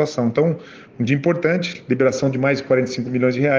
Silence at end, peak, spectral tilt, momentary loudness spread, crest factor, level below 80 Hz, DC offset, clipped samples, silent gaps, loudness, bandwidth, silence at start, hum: 0 s; -4 dBFS; -6.5 dB/octave; 5 LU; 14 dB; -60 dBFS; under 0.1%; under 0.1%; none; -19 LUFS; 7.6 kHz; 0 s; none